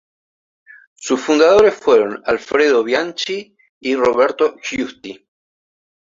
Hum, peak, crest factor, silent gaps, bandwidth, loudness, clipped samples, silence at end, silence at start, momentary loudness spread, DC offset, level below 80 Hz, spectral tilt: none; 0 dBFS; 16 dB; 3.69-3.81 s; 7.6 kHz; -16 LUFS; under 0.1%; 0.85 s; 1 s; 15 LU; under 0.1%; -54 dBFS; -3.5 dB/octave